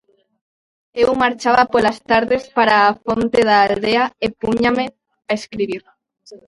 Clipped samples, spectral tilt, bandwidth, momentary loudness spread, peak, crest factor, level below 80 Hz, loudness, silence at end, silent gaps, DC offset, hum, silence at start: under 0.1%; -5 dB/octave; 11.5 kHz; 11 LU; 0 dBFS; 18 dB; -48 dBFS; -16 LUFS; 0.1 s; none; under 0.1%; none; 0.95 s